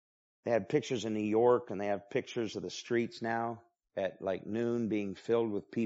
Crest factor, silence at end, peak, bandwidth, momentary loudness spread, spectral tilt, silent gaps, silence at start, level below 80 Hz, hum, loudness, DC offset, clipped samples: 18 dB; 0 s; -14 dBFS; 8 kHz; 9 LU; -5 dB/octave; none; 0.45 s; -76 dBFS; none; -34 LUFS; under 0.1%; under 0.1%